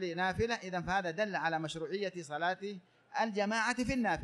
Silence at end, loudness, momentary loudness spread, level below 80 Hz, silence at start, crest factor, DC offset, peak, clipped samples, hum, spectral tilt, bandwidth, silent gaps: 0 s; -35 LUFS; 7 LU; -58 dBFS; 0 s; 16 dB; under 0.1%; -18 dBFS; under 0.1%; none; -4.5 dB/octave; 12 kHz; none